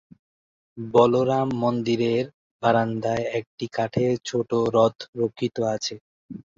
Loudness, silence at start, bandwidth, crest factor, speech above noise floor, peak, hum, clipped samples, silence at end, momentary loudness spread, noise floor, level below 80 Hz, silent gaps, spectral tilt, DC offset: -24 LUFS; 0.75 s; 7.6 kHz; 20 dB; over 67 dB; -4 dBFS; none; under 0.1%; 0.15 s; 12 LU; under -90 dBFS; -60 dBFS; 2.34-2.60 s, 3.47-3.58 s, 5.08-5.13 s, 6.01-6.29 s; -6 dB/octave; under 0.1%